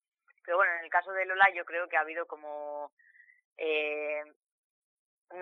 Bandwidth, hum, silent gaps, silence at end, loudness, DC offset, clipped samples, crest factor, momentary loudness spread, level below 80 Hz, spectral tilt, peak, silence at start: 6.6 kHz; none; 2.92-2.97 s, 3.45-3.56 s, 4.36-4.41 s, 4.52-5.25 s; 0 s; -30 LUFS; under 0.1%; under 0.1%; 24 dB; 19 LU; under -90 dBFS; -3.5 dB/octave; -8 dBFS; 0.45 s